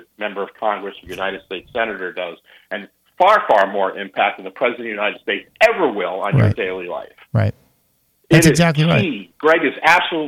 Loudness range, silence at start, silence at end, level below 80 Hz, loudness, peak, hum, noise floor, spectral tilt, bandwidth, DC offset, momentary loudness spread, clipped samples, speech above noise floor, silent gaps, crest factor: 3 LU; 0.2 s; 0 s; -48 dBFS; -17 LUFS; -2 dBFS; none; -63 dBFS; -5.5 dB/octave; 16 kHz; under 0.1%; 15 LU; under 0.1%; 45 dB; none; 16 dB